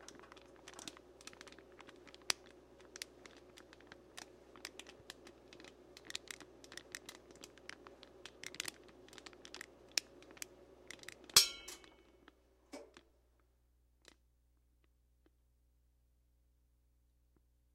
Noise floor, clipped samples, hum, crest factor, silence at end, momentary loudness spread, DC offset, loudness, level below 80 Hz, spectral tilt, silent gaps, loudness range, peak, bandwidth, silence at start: -74 dBFS; under 0.1%; 60 Hz at -75 dBFS; 40 dB; 4.75 s; 19 LU; under 0.1%; -39 LUFS; -72 dBFS; 0.5 dB/octave; none; 17 LU; -6 dBFS; 15.5 kHz; 0 s